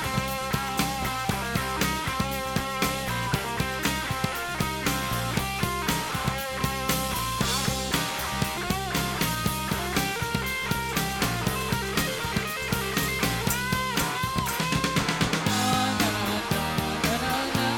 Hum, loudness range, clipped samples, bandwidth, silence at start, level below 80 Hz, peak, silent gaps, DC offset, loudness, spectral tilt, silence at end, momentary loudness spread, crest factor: none; 2 LU; under 0.1%; 19 kHz; 0 s; -42 dBFS; -10 dBFS; none; under 0.1%; -27 LUFS; -3.5 dB/octave; 0 s; 3 LU; 18 dB